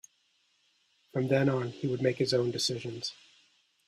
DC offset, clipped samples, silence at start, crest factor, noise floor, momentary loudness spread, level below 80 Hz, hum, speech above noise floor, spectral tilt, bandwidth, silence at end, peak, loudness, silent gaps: under 0.1%; under 0.1%; 1.15 s; 20 dB; -72 dBFS; 11 LU; -70 dBFS; none; 42 dB; -5 dB/octave; 14 kHz; 0.75 s; -12 dBFS; -30 LUFS; none